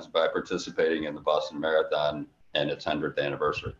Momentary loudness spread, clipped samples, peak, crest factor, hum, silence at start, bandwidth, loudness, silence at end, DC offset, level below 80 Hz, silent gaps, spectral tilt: 5 LU; under 0.1%; -10 dBFS; 18 dB; none; 0 s; 7.8 kHz; -28 LUFS; 0.05 s; under 0.1%; -56 dBFS; none; -5 dB/octave